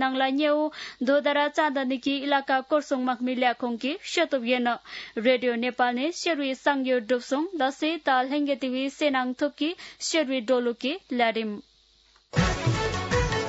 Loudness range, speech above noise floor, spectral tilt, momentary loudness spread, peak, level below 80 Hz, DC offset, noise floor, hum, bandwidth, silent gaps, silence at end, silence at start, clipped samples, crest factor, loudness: 2 LU; 35 dB; -4.5 dB/octave; 6 LU; -10 dBFS; -46 dBFS; under 0.1%; -61 dBFS; none; 8 kHz; none; 0 s; 0 s; under 0.1%; 16 dB; -26 LUFS